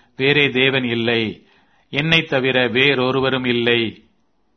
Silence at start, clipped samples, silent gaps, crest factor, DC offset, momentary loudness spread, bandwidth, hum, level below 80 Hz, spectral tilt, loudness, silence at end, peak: 0.2 s; under 0.1%; none; 18 dB; under 0.1%; 7 LU; 6.4 kHz; none; -54 dBFS; -6 dB/octave; -17 LUFS; 0.6 s; 0 dBFS